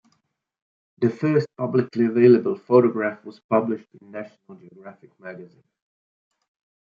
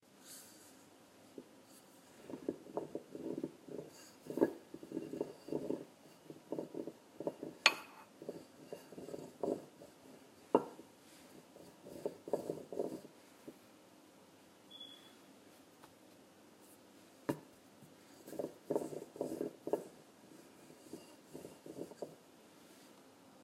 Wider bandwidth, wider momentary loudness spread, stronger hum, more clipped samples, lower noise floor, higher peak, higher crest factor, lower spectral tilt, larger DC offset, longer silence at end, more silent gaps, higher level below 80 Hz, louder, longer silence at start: second, 5 kHz vs 16 kHz; about the same, 24 LU vs 22 LU; neither; neither; first, -71 dBFS vs -63 dBFS; first, -4 dBFS vs -10 dBFS; second, 20 dB vs 36 dB; first, -9.5 dB/octave vs -3.5 dB/octave; neither; first, 1.4 s vs 0 s; first, 3.44-3.49 s vs none; first, -72 dBFS vs -84 dBFS; first, -21 LUFS vs -43 LUFS; first, 1 s vs 0.1 s